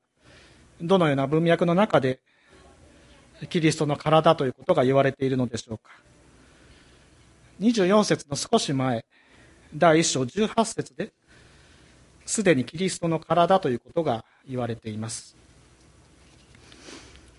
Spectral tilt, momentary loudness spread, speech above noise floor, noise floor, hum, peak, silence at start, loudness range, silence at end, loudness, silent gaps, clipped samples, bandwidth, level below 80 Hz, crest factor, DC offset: -5 dB/octave; 16 LU; 32 dB; -55 dBFS; none; -4 dBFS; 0.8 s; 4 LU; 0.4 s; -24 LUFS; none; under 0.1%; 11.5 kHz; -58 dBFS; 22 dB; under 0.1%